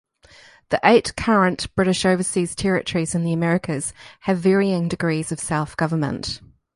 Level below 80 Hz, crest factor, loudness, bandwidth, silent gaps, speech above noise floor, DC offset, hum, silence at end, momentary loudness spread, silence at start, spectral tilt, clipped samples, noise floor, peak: -48 dBFS; 20 dB; -21 LUFS; 11.5 kHz; none; 29 dB; under 0.1%; none; 0.3 s; 9 LU; 0.7 s; -5 dB/octave; under 0.1%; -50 dBFS; 0 dBFS